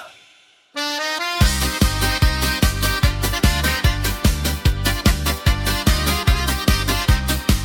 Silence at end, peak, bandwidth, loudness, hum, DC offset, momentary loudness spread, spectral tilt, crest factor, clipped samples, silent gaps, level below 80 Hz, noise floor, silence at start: 0 s; -2 dBFS; 18 kHz; -19 LUFS; none; under 0.1%; 3 LU; -4 dB/octave; 16 dB; under 0.1%; none; -22 dBFS; -53 dBFS; 0 s